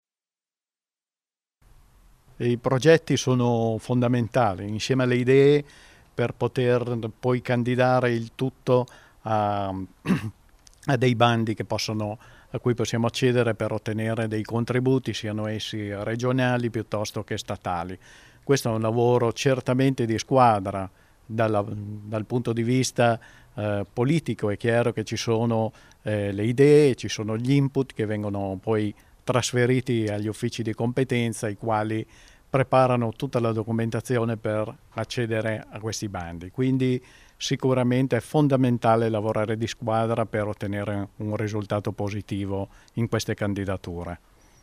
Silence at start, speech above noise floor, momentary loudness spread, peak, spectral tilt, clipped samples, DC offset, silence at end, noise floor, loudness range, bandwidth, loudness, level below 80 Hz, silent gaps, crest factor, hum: 2.4 s; over 66 dB; 12 LU; -4 dBFS; -6 dB/octave; under 0.1%; under 0.1%; 0.45 s; under -90 dBFS; 5 LU; 15 kHz; -25 LUFS; -56 dBFS; none; 22 dB; none